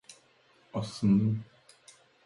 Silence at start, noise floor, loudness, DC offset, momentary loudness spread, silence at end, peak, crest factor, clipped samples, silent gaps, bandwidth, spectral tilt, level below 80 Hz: 0.1 s; -64 dBFS; -30 LUFS; under 0.1%; 12 LU; 0.8 s; -16 dBFS; 16 dB; under 0.1%; none; 11.5 kHz; -7.5 dB/octave; -62 dBFS